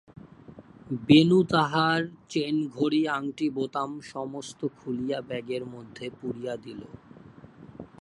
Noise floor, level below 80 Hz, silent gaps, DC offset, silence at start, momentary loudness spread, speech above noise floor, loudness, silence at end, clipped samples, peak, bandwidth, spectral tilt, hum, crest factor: -49 dBFS; -64 dBFS; none; under 0.1%; 0.25 s; 20 LU; 23 dB; -27 LUFS; 0.15 s; under 0.1%; -4 dBFS; 11 kHz; -6 dB/octave; none; 24 dB